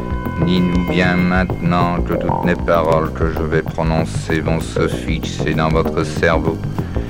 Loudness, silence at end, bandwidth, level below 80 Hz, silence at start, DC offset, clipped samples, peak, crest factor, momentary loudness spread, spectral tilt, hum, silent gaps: -17 LUFS; 0 s; 16.5 kHz; -28 dBFS; 0 s; under 0.1%; under 0.1%; 0 dBFS; 16 dB; 5 LU; -7 dB/octave; none; none